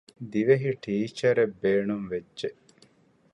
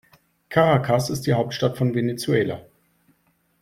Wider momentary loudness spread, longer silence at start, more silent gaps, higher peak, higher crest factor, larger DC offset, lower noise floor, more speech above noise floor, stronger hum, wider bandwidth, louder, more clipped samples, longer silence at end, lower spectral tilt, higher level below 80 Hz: first, 12 LU vs 6 LU; second, 0.2 s vs 0.5 s; neither; second, -8 dBFS vs -4 dBFS; about the same, 18 dB vs 18 dB; neither; second, -62 dBFS vs -66 dBFS; second, 36 dB vs 45 dB; neither; second, 10 kHz vs 15.5 kHz; second, -27 LUFS vs -22 LUFS; neither; second, 0.8 s vs 1 s; about the same, -7 dB/octave vs -6 dB/octave; second, -66 dBFS vs -56 dBFS